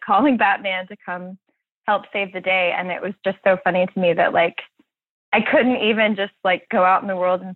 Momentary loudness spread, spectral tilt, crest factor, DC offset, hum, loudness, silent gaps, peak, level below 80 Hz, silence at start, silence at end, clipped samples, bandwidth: 12 LU; -8.5 dB/octave; 16 dB; under 0.1%; none; -19 LUFS; 1.71-1.81 s, 5.10-5.32 s; -4 dBFS; -66 dBFS; 0 s; 0 s; under 0.1%; 4.3 kHz